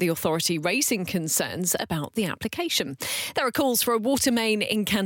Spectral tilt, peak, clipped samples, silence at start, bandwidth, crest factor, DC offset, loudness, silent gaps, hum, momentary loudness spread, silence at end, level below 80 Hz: -3 dB/octave; -10 dBFS; under 0.1%; 0 s; 17 kHz; 14 dB; under 0.1%; -24 LUFS; none; none; 6 LU; 0 s; -58 dBFS